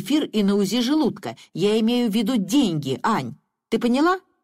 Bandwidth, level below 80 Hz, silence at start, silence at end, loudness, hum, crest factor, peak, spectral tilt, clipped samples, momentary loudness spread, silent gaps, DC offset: 16 kHz; -60 dBFS; 0 s; 0.25 s; -21 LUFS; none; 12 dB; -10 dBFS; -5.5 dB/octave; under 0.1%; 7 LU; none; under 0.1%